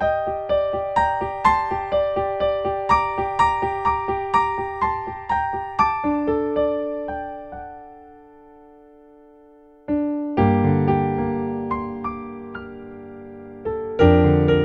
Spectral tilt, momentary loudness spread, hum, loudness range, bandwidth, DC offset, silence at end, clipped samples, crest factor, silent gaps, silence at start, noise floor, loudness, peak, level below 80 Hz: -8 dB/octave; 17 LU; none; 7 LU; 8.4 kHz; under 0.1%; 0 s; under 0.1%; 20 dB; none; 0 s; -49 dBFS; -21 LUFS; -2 dBFS; -40 dBFS